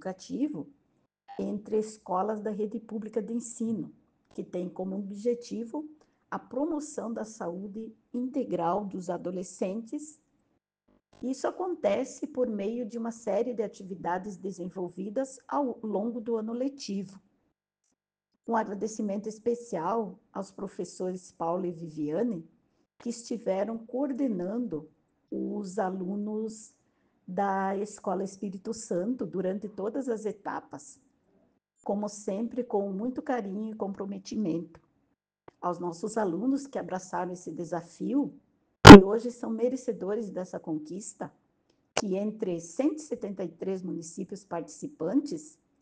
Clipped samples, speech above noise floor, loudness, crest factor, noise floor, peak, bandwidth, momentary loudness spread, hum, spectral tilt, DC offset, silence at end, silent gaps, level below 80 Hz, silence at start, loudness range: under 0.1%; 52 dB; -27 LUFS; 28 dB; -83 dBFS; 0 dBFS; 10 kHz; 9 LU; none; -6 dB/octave; under 0.1%; 0.35 s; none; -46 dBFS; 0.05 s; 18 LU